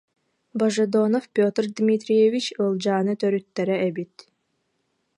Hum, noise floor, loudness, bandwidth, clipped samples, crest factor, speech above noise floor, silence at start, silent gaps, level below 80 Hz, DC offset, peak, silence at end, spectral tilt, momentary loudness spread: none; -73 dBFS; -22 LUFS; 11 kHz; under 0.1%; 16 dB; 51 dB; 0.55 s; none; -74 dBFS; under 0.1%; -8 dBFS; 1.1 s; -6 dB/octave; 7 LU